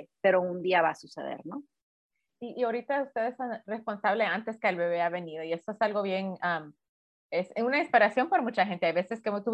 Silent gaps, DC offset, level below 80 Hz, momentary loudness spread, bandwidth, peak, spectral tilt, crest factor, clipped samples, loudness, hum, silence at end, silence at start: 1.82-2.10 s, 6.89-7.29 s; under 0.1%; -80 dBFS; 13 LU; 9.2 kHz; -8 dBFS; -6 dB/octave; 22 dB; under 0.1%; -29 LUFS; none; 0 s; 0 s